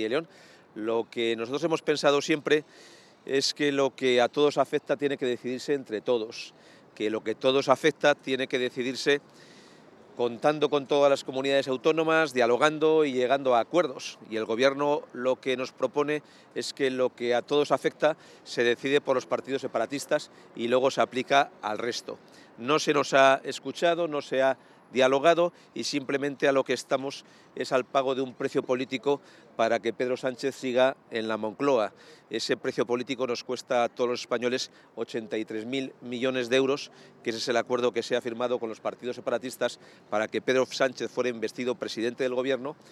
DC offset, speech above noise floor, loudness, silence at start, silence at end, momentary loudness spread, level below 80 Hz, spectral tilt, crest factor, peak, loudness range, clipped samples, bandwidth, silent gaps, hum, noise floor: under 0.1%; 26 dB; -27 LUFS; 0 s; 0.2 s; 11 LU; -86 dBFS; -4 dB/octave; 22 dB; -6 dBFS; 5 LU; under 0.1%; 13 kHz; none; none; -53 dBFS